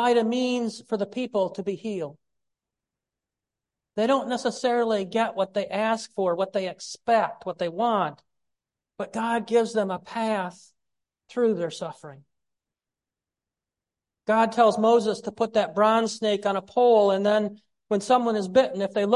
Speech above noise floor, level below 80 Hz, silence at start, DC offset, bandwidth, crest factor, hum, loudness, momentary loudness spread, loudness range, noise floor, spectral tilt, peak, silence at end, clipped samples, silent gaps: 66 dB; -72 dBFS; 0 s; under 0.1%; 11.5 kHz; 18 dB; none; -25 LUFS; 12 LU; 9 LU; -90 dBFS; -5 dB/octave; -6 dBFS; 0 s; under 0.1%; none